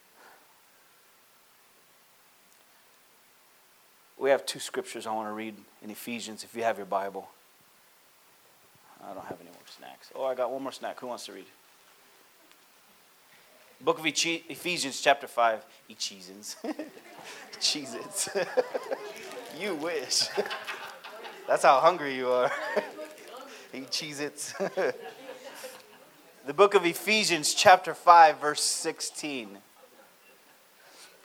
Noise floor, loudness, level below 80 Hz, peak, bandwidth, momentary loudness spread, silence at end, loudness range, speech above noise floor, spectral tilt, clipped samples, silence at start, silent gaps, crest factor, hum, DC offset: -60 dBFS; -27 LUFS; -86 dBFS; -4 dBFS; over 20 kHz; 23 LU; 0.2 s; 15 LU; 32 dB; -2 dB/octave; under 0.1%; 4.2 s; none; 26 dB; none; under 0.1%